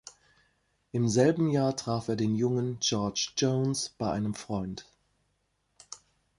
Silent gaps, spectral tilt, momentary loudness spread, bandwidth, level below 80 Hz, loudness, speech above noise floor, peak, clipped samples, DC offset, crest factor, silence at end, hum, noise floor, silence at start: none; -5 dB/octave; 17 LU; 11.5 kHz; -60 dBFS; -29 LUFS; 47 dB; -10 dBFS; under 0.1%; under 0.1%; 20 dB; 0.4 s; none; -75 dBFS; 0.05 s